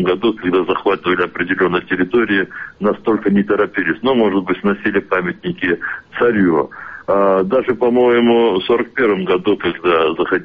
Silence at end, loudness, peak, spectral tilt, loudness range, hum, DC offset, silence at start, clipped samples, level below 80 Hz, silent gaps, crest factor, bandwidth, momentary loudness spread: 0 s; -16 LUFS; -4 dBFS; -8.5 dB/octave; 2 LU; none; under 0.1%; 0 s; under 0.1%; -50 dBFS; none; 12 dB; 5 kHz; 6 LU